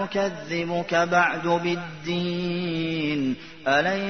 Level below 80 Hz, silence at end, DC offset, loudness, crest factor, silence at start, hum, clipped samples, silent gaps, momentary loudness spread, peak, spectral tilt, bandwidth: -60 dBFS; 0 s; 0.3%; -25 LUFS; 18 dB; 0 s; none; under 0.1%; none; 8 LU; -6 dBFS; -5.5 dB/octave; 6.6 kHz